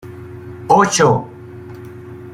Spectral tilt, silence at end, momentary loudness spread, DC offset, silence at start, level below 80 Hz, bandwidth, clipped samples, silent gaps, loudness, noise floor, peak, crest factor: -4.5 dB/octave; 0 s; 22 LU; under 0.1%; 0.05 s; -52 dBFS; 16 kHz; under 0.1%; none; -14 LUFS; -34 dBFS; -2 dBFS; 16 dB